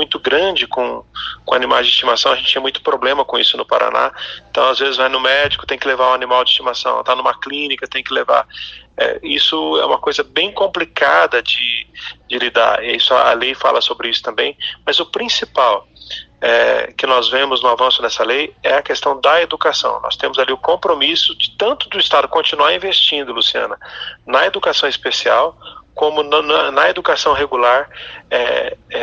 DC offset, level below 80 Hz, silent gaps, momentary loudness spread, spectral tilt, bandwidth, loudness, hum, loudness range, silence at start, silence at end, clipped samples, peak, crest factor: under 0.1%; -50 dBFS; none; 8 LU; -2 dB/octave; 8 kHz; -14 LUFS; none; 2 LU; 0 s; 0 s; under 0.1%; 0 dBFS; 16 dB